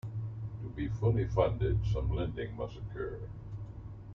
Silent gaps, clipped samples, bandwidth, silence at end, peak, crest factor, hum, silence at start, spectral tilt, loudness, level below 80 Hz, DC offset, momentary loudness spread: none; under 0.1%; 6.4 kHz; 0 s; -14 dBFS; 20 dB; none; 0.05 s; -9 dB/octave; -35 LUFS; -42 dBFS; under 0.1%; 14 LU